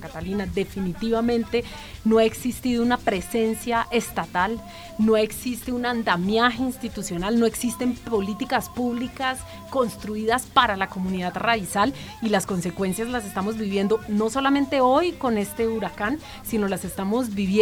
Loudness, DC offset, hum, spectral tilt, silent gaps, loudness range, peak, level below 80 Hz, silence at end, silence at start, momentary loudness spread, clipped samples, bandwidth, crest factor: -24 LUFS; under 0.1%; none; -5 dB/octave; none; 2 LU; -2 dBFS; -46 dBFS; 0 s; 0 s; 8 LU; under 0.1%; 17.5 kHz; 20 dB